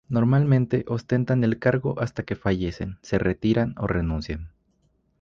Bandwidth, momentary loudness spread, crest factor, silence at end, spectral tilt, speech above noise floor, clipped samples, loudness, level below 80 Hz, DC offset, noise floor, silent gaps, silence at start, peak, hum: 7.2 kHz; 10 LU; 16 dB; 0.75 s; -8.5 dB/octave; 44 dB; under 0.1%; -24 LUFS; -40 dBFS; under 0.1%; -67 dBFS; none; 0.1 s; -8 dBFS; none